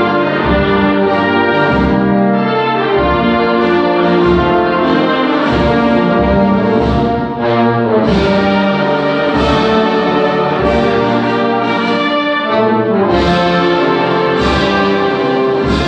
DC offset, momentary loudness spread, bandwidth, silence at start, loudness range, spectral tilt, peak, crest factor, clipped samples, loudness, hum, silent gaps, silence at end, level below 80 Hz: under 0.1%; 2 LU; 8.6 kHz; 0 s; 1 LU; -7 dB/octave; 0 dBFS; 12 dB; under 0.1%; -12 LUFS; none; none; 0 s; -30 dBFS